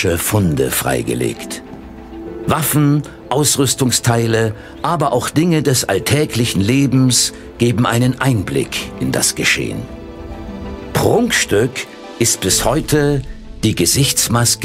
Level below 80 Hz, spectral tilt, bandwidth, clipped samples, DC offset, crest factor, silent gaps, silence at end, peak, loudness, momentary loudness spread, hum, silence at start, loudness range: -36 dBFS; -4 dB/octave; 16 kHz; under 0.1%; under 0.1%; 16 dB; none; 0 s; 0 dBFS; -15 LUFS; 16 LU; none; 0 s; 3 LU